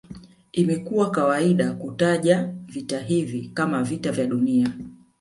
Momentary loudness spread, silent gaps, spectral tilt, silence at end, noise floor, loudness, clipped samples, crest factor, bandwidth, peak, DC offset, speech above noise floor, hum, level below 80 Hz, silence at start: 10 LU; none; -6.5 dB/octave; 0.25 s; -44 dBFS; -23 LUFS; under 0.1%; 18 dB; 11.5 kHz; -4 dBFS; under 0.1%; 21 dB; none; -60 dBFS; 0.1 s